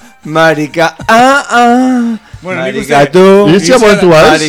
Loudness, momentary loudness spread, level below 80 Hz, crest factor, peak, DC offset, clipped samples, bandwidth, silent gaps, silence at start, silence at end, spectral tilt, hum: -7 LUFS; 11 LU; -38 dBFS; 6 dB; 0 dBFS; under 0.1%; 5%; 18.5 kHz; none; 0.25 s; 0 s; -5 dB/octave; none